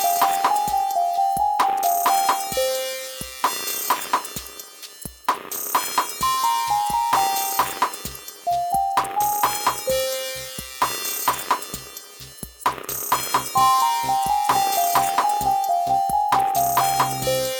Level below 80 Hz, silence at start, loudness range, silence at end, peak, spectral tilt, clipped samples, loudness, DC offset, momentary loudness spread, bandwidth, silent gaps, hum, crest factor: -52 dBFS; 0 s; 5 LU; 0 s; -6 dBFS; -1.5 dB/octave; under 0.1%; -21 LUFS; under 0.1%; 12 LU; 19.5 kHz; none; none; 16 dB